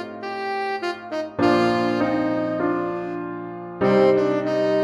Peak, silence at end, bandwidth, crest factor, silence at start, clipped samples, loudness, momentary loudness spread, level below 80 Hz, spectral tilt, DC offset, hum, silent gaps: -6 dBFS; 0 s; 11 kHz; 16 dB; 0 s; under 0.1%; -22 LUFS; 12 LU; -58 dBFS; -7 dB/octave; under 0.1%; none; none